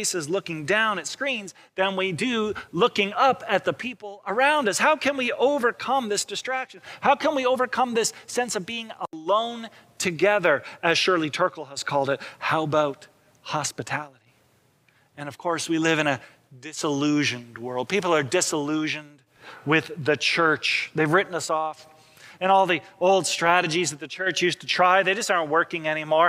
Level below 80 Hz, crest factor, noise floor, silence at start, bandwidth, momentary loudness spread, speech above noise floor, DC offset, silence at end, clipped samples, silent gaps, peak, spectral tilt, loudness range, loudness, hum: -70 dBFS; 20 dB; -63 dBFS; 0 s; 16.5 kHz; 11 LU; 39 dB; under 0.1%; 0 s; under 0.1%; none; -4 dBFS; -3.5 dB/octave; 6 LU; -24 LUFS; none